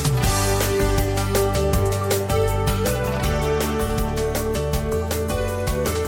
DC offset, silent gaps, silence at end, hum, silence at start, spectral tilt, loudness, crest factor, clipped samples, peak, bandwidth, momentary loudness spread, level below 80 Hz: under 0.1%; none; 0 s; none; 0 s; -5 dB/octave; -22 LUFS; 14 dB; under 0.1%; -8 dBFS; 17 kHz; 4 LU; -28 dBFS